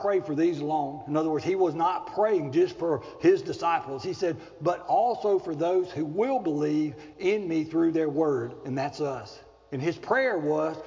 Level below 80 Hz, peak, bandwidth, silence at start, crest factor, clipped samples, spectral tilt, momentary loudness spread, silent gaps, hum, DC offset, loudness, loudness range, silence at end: -64 dBFS; -10 dBFS; 7.6 kHz; 0 s; 16 dB; under 0.1%; -7 dB/octave; 7 LU; none; none; under 0.1%; -27 LUFS; 2 LU; 0 s